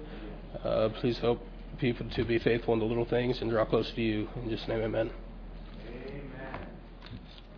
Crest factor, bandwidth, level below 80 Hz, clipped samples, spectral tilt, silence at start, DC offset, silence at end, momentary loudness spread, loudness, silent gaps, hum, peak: 20 dB; 5.4 kHz; -46 dBFS; under 0.1%; -5.5 dB/octave; 0 s; under 0.1%; 0 s; 18 LU; -31 LUFS; none; none; -12 dBFS